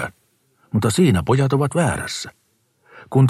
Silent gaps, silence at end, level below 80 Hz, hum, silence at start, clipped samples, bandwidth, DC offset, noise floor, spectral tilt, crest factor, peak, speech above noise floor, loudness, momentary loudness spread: none; 0 s; -46 dBFS; none; 0 s; under 0.1%; 13.5 kHz; under 0.1%; -63 dBFS; -6 dB/octave; 16 dB; -4 dBFS; 46 dB; -19 LUFS; 13 LU